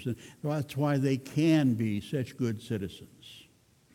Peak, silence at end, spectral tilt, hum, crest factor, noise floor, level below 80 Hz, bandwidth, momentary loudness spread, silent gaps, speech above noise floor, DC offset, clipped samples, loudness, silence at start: -14 dBFS; 0.55 s; -7 dB/octave; none; 16 dB; -63 dBFS; -66 dBFS; 17 kHz; 22 LU; none; 33 dB; under 0.1%; under 0.1%; -30 LUFS; 0 s